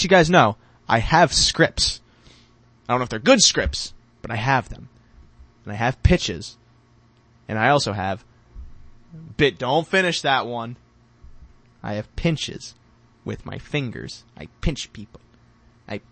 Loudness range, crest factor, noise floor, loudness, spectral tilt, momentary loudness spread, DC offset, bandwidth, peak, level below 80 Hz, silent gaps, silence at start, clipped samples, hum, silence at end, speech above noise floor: 11 LU; 22 dB; -56 dBFS; -20 LUFS; -3.5 dB/octave; 22 LU; under 0.1%; 8.8 kHz; 0 dBFS; -38 dBFS; none; 0 s; under 0.1%; none; 0.15 s; 35 dB